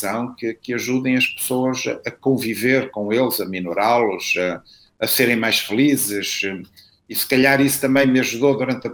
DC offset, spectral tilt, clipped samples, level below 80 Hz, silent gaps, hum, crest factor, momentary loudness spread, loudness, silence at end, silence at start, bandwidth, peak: under 0.1%; -4 dB/octave; under 0.1%; -60 dBFS; none; none; 18 dB; 9 LU; -19 LUFS; 0 s; 0 s; over 20 kHz; -2 dBFS